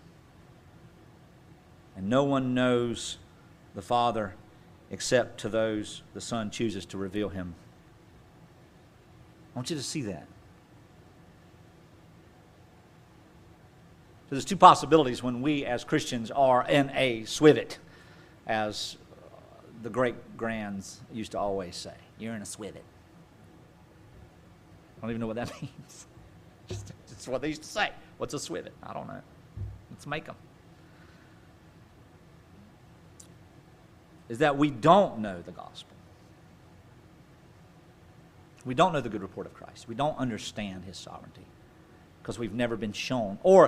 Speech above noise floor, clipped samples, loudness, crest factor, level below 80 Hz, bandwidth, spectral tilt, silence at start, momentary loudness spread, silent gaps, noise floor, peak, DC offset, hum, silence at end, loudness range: 28 dB; under 0.1%; -28 LUFS; 30 dB; -58 dBFS; 15.5 kHz; -5 dB/octave; 1.95 s; 22 LU; none; -56 dBFS; 0 dBFS; under 0.1%; none; 0 s; 16 LU